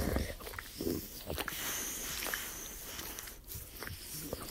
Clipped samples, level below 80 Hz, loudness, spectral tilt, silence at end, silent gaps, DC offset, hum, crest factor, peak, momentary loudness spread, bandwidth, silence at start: under 0.1%; -50 dBFS; -40 LUFS; -3 dB/octave; 0 s; none; under 0.1%; none; 22 dB; -18 dBFS; 8 LU; 16.5 kHz; 0 s